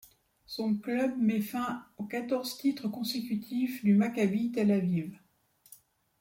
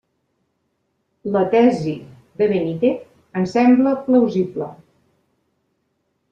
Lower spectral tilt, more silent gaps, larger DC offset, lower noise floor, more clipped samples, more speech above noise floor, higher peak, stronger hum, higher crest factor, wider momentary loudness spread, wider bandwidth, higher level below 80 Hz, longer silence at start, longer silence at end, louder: second, -6.5 dB/octave vs -8 dB/octave; neither; neither; about the same, -67 dBFS vs -70 dBFS; neither; second, 37 dB vs 53 dB; second, -16 dBFS vs -4 dBFS; neither; about the same, 16 dB vs 16 dB; second, 10 LU vs 16 LU; first, 17 kHz vs 7.6 kHz; second, -72 dBFS vs -62 dBFS; second, 0.5 s vs 1.25 s; second, 0.45 s vs 1.55 s; second, -31 LUFS vs -18 LUFS